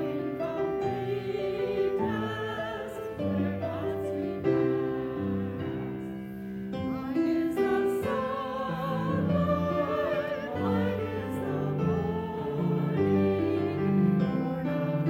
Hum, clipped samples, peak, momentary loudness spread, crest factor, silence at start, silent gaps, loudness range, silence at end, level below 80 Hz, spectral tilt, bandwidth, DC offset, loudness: none; under 0.1%; -14 dBFS; 8 LU; 14 dB; 0 s; none; 3 LU; 0 s; -56 dBFS; -8.5 dB/octave; 16.5 kHz; under 0.1%; -30 LUFS